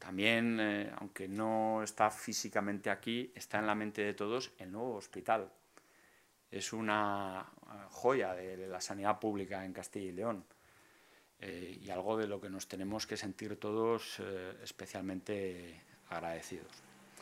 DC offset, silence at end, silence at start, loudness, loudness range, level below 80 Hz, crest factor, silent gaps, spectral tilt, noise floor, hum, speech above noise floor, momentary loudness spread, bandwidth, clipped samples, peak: under 0.1%; 0 s; 0 s; -38 LUFS; 6 LU; -78 dBFS; 26 dB; none; -4 dB/octave; -69 dBFS; none; 30 dB; 14 LU; 16 kHz; under 0.1%; -12 dBFS